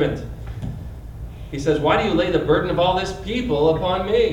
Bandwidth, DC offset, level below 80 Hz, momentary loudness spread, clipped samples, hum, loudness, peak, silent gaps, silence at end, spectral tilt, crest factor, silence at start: 11 kHz; under 0.1%; -36 dBFS; 17 LU; under 0.1%; none; -20 LUFS; -4 dBFS; none; 0 s; -6.5 dB/octave; 16 dB; 0 s